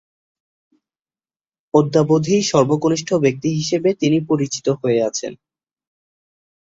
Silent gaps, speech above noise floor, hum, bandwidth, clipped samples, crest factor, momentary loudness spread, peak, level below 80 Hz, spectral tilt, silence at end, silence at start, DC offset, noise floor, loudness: none; over 73 dB; none; 8 kHz; under 0.1%; 18 dB; 5 LU; -2 dBFS; -58 dBFS; -5.5 dB/octave; 1.3 s; 1.75 s; under 0.1%; under -90 dBFS; -18 LUFS